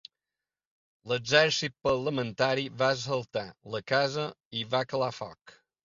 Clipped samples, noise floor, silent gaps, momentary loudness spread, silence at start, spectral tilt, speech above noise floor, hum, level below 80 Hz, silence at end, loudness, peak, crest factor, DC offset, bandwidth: under 0.1%; under -90 dBFS; 4.45-4.51 s, 5.41-5.45 s; 13 LU; 1.05 s; -4 dB/octave; over 61 dB; none; -64 dBFS; 0.35 s; -29 LUFS; -6 dBFS; 24 dB; under 0.1%; 7.6 kHz